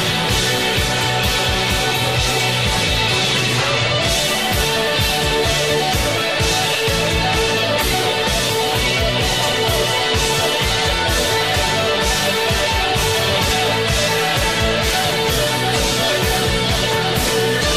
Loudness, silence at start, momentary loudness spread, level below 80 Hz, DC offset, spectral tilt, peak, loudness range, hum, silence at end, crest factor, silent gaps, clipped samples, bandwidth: -16 LUFS; 0 s; 1 LU; -30 dBFS; 0.6%; -3 dB/octave; -4 dBFS; 0 LU; none; 0 s; 14 dB; none; under 0.1%; 15.5 kHz